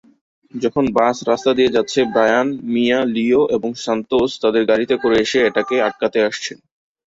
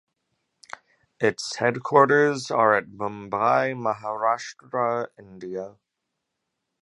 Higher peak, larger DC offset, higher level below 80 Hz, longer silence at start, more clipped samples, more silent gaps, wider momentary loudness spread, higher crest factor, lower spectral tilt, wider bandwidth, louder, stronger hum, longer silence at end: about the same, -2 dBFS vs -2 dBFS; neither; first, -52 dBFS vs -68 dBFS; second, 0.55 s vs 1.2 s; neither; neither; second, 6 LU vs 21 LU; second, 14 dB vs 22 dB; about the same, -4.5 dB/octave vs -5 dB/octave; second, 8 kHz vs 11.5 kHz; first, -17 LUFS vs -23 LUFS; neither; second, 0.65 s vs 1.15 s